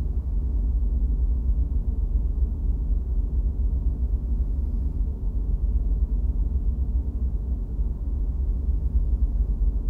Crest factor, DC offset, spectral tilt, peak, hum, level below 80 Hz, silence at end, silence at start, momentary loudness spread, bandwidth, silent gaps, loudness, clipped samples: 12 dB; under 0.1%; -12 dB/octave; -12 dBFS; none; -24 dBFS; 0 s; 0 s; 3 LU; 1.2 kHz; none; -27 LUFS; under 0.1%